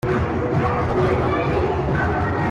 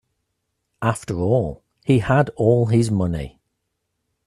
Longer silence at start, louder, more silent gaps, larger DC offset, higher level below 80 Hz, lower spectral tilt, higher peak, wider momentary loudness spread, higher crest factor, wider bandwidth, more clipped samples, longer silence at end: second, 0.05 s vs 0.8 s; about the same, -20 LUFS vs -20 LUFS; neither; neither; first, -34 dBFS vs -46 dBFS; about the same, -8 dB/octave vs -7.5 dB/octave; second, -8 dBFS vs -2 dBFS; second, 2 LU vs 12 LU; second, 12 dB vs 18 dB; second, 10 kHz vs 11.5 kHz; neither; second, 0 s vs 0.95 s